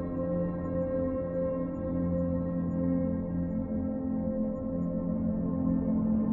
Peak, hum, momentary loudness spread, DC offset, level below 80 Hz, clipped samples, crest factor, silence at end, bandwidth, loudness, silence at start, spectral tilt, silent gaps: -18 dBFS; none; 4 LU; under 0.1%; -46 dBFS; under 0.1%; 12 dB; 0 s; 2.8 kHz; -31 LUFS; 0 s; -13.5 dB/octave; none